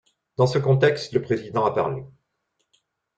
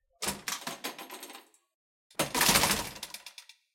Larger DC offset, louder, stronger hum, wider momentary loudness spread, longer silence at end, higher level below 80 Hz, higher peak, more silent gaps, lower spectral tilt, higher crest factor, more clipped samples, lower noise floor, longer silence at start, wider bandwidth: neither; first, -22 LUFS vs -29 LUFS; neither; second, 10 LU vs 22 LU; first, 1.1 s vs 0.35 s; about the same, -60 dBFS vs -56 dBFS; about the same, -6 dBFS vs -8 dBFS; second, none vs 1.75-2.10 s; first, -7 dB/octave vs -1.5 dB/octave; second, 18 dB vs 26 dB; neither; first, -75 dBFS vs -53 dBFS; first, 0.4 s vs 0.2 s; second, 8.8 kHz vs 17 kHz